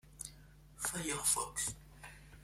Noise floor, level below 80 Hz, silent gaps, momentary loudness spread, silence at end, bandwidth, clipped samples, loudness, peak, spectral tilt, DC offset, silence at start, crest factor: -59 dBFS; -60 dBFS; none; 22 LU; 0 s; 16.5 kHz; under 0.1%; -36 LUFS; -18 dBFS; -1.5 dB/octave; under 0.1%; 0.05 s; 22 dB